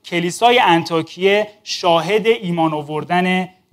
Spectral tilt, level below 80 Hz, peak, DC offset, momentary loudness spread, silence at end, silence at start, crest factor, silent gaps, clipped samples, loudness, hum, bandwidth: -4.5 dB/octave; -66 dBFS; 0 dBFS; under 0.1%; 8 LU; 0.25 s; 0.05 s; 16 dB; none; under 0.1%; -16 LUFS; none; 16 kHz